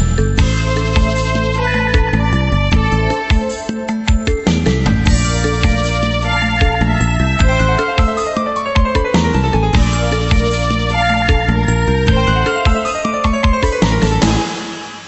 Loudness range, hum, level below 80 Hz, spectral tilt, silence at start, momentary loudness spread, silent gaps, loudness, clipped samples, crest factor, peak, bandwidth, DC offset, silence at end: 1 LU; none; -18 dBFS; -5.5 dB/octave; 0 s; 3 LU; none; -15 LUFS; under 0.1%; 12 dB; 0 dBFS; 8.4 kHz; under 0.1%; 0 s